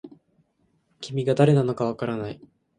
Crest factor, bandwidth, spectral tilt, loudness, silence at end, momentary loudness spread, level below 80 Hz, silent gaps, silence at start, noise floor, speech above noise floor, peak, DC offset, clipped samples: 20 dB; 9.8 kHz; -8 dB/octave; -23 LUFS; 0.4 s; 19 LU; -62 dBFS; none; 0.05 s; -68 dBFS; 45 dB; -4 dBFS; under 0.1%; under 0.1%